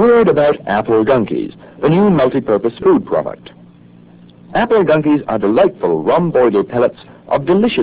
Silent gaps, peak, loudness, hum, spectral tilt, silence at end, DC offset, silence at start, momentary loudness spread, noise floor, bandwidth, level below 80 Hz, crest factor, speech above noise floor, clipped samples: none; 0 dBFS; -14 LUFS; none; -11 dB/octave; 0 s; under 0.1%; 0 s; 8 LU; -42 dBFS; 4 kHz; -46 dBFS; 14 dB; 29 dB; under 0.1%